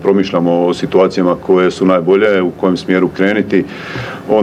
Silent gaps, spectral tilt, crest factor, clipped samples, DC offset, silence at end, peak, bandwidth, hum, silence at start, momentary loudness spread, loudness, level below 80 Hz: none; -7 dB/octave; 12 dB; under 0.1%; under 0.1%; 0 s; 0 dBFS; 9.8 kHz; none; 0 s; 5 LU; -13 LUFS; -50 dBFS